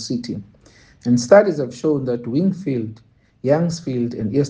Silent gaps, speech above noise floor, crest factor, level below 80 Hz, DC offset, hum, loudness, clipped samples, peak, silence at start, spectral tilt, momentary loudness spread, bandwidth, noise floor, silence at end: none; 31 dB; 20 dB; -58 dBFS; under 0.1%; none; -19 LUFS; under 0.1%; 0 dBFS; 0 s; -6.5 dB/octave; 15 LU; 9.8 kHz; -50 dBFS; 0 s